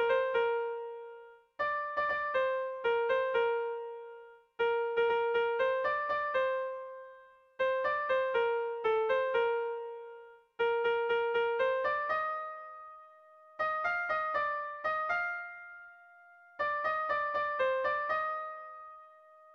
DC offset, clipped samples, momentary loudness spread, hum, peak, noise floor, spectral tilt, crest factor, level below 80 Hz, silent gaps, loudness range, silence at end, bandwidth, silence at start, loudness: under 0.1%; under 0.1%; 19 LU; none; -18 dBFS; -58 dBFS; -4 dB/octave; 14 dB; -72 dBFS; none; 3 LU; 0.4 s; 6.4 kHz; 0 s; -32 LUFS